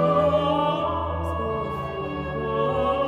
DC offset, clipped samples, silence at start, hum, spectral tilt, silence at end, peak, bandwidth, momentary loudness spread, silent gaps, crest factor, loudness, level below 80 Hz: under 0.1%; under 0.1%; 0 s; none; -8 dB/octave; 0 s; -10 dBFS; 11 kHz; 9 LU; none; 14 dB; -25 LUFS; -44 dBFS